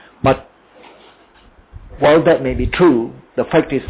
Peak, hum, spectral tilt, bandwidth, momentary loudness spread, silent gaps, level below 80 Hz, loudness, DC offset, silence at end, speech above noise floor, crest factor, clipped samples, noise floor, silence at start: -2 dBFS; none; -11 dB/octave; 4 kHz; 10 LU; none; -34 dBFS; -15 LUFS; under 0.1%; 0 s; 34 dB; 16 dB; under 0.1%; -48 dBFS; 0.25 s